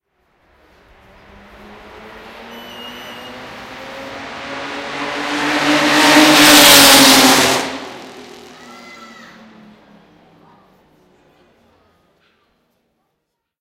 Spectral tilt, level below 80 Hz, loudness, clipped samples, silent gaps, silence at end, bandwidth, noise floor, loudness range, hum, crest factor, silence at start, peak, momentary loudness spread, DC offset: -1 dB/octave; -50 dBFS; -8 LUFS; 0.2%; none; 5.4 s; over 20 kHz; -74 dBFS; 23 LU; none; 16 dB; 2.4 s; 0 dBFS; 28 LU; under 0.1%